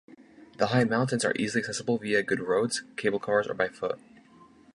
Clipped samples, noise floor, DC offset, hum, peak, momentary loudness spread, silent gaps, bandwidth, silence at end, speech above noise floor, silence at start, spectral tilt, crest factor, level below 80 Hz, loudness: under 0.1%; -55 dBFS; under 0.1%; none; -10 dBFS; 5 LU; none; 11.5 kHz; 0.75 s; 28 dB; 0.1 s; -4.5 dB/octave; 20 dB; -66 dBFS; -28 LUFS